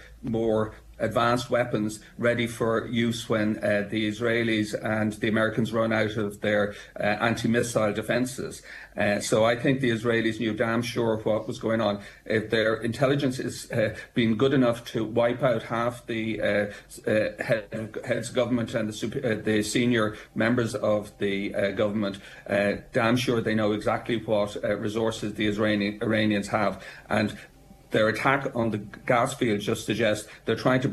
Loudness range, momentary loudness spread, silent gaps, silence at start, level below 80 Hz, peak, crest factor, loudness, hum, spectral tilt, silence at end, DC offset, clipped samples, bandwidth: 2 LU; 6 LU; none; 0 s; -54 dBFS; -8 dBFS; 18 dB; -26 LUFS; none; -5.5 dB/octave; 0 s; under 0.1%; under 0.1%; 13 kHz